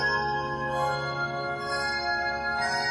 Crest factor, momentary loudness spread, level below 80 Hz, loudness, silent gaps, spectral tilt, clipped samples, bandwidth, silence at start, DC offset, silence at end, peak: 14 dB; 4 LU; -52 dBFS; -28 LUFS; none; -4 dB/octave; under 0.1%; 13.5 kHz; 0 s; under 0.1%; 0 s; -16 dBFS